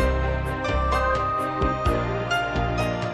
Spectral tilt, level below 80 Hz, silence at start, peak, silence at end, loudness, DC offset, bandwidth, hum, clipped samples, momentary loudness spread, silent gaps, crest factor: -6 dB/octave; -30 dBFS; 0 s; -10 dBFS; 0 s; -24 LUFS; under 0.1%; 12.5 kHz; none; under 0.1%; 3 LU; none; 14 dB